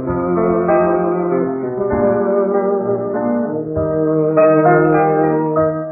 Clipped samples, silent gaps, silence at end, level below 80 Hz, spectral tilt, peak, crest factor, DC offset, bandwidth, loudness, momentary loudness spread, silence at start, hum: under 0.1%; none; 0 s; -44 dBFS; -16 dB/octave; -2 dBFS; 14 dB; under 0.1%; 2.8 kHz; -15 LUFS; 7 LU; 0 s; none